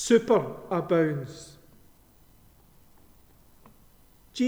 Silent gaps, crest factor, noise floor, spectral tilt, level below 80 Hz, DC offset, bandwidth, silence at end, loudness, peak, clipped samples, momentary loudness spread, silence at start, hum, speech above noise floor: none; 22 dB; -57 dBFS; -5.5 dB/octave; -62 dBFS; under 0.1%; over 20 kHz; 0 s; -26 LUFS; -8 dBFS; under 0.1%; 23 LU; 0 s; none; 32 dB